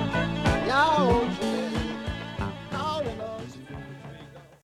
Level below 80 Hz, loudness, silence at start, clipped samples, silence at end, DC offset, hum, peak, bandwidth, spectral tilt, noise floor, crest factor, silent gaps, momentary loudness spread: -42 dBFS; -27 LUFS; 0 s; under 0.1%; 0.15 s; under 0.1%; none; -10 dBFS; 14.5 kHz; -6 dB/octave; -47 dBFS; 18 dB; none; 19 LU